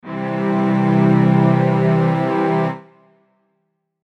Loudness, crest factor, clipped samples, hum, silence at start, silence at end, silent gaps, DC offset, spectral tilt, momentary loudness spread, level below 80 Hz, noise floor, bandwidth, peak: -16 LUFS; 14 dB; under 0.1%; none; 0.05 s; 1.25 s; none; under 0.1%; -9.5 dB/octave; 9 LU; -66 dBFS; -70 dBFS; 6 kHz; -4 dBFS